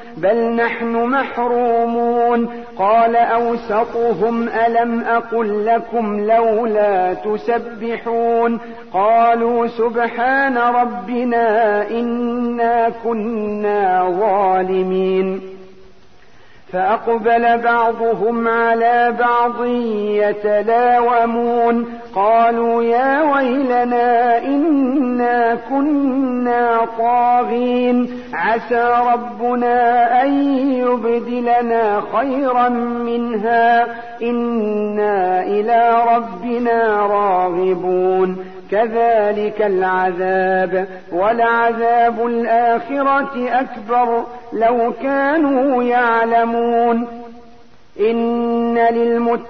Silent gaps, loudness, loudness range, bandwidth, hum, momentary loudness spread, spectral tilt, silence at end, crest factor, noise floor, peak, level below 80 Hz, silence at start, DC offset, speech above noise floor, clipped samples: none; -16 LUFS; 2 LU; 6 kHz; none; 6 LU; -8 dB/octave; 0 s; 12 dB; -48 dBFS; -4 dBFS; -54 dBFS; 0 s; 0.9%; 33 dB; under 0.1%